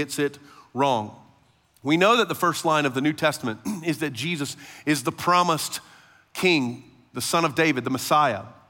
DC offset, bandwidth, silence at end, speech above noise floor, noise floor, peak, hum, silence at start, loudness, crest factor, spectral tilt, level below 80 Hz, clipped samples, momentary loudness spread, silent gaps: under 0.1%; 17 kHz; 0.15 s; 37 dB; -61 dBFS; -4 dBFS; none; 0 s; -23 LUFS; 20 dB; -4 dB/octave; -70 dBFS; under 0.1%; 12 LU; none